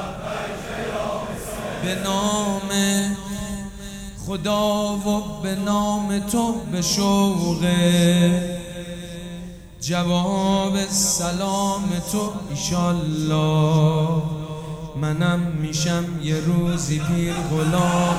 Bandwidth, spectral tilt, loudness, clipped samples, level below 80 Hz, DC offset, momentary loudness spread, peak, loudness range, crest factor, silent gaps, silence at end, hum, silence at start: over 20 kHz; -5 dB/octave; -22 LUFS; under 0.1%; -42 dBFS; under 0.1%; 13 LU; -6 dBFS; 4 LU; 16 dB; none; 0 s; none; 0 s